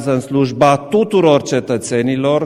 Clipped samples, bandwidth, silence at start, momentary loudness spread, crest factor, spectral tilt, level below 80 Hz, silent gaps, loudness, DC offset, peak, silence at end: under 0.1%; 14 kHz; 0 s; 6 LU; 14 dB; -6 dB/octave; -52 dBFS; none; -14 LUFS; under 0.1%; 0 dBFS; 0 s